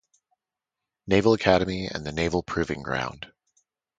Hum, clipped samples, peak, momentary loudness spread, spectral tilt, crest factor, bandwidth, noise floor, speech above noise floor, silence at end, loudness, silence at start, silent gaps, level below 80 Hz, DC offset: none; under 0.1%; -4 dBFS; 18 LU; -6 dB/octave; 24 dB; 9.2 kHz; -88 dBFS; 63 dB; 0.7 s; -25 LUFS; 1.05 s; none; -48 dBFS; under 0.1%